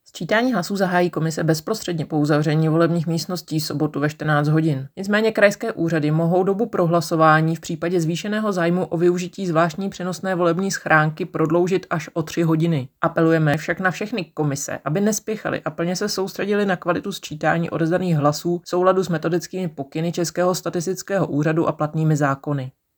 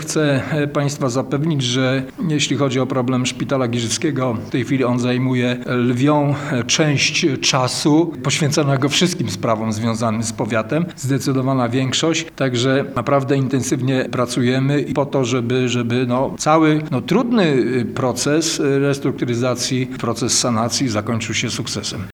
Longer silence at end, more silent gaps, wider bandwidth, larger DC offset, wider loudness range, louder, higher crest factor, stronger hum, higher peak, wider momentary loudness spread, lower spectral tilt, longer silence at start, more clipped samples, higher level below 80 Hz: first, 0.25 s vs 0 s; neither; first, over 20 kHz vs 17.5 kHz; neither; about the same, 3 LU vs 3 LU; second, -21 LUFS vs -18 LUFS; about the same, 20 dB vs 18 dB; neither; about the same, -2 dBFS vs 0 dBFS; about the same, 7 LU vs 5 LU; first, -6 dB/octave vs -4.5 dB/octave; first, 0.15 s vs 0 s; neither; second, -62 dBFS vs -52 dBFS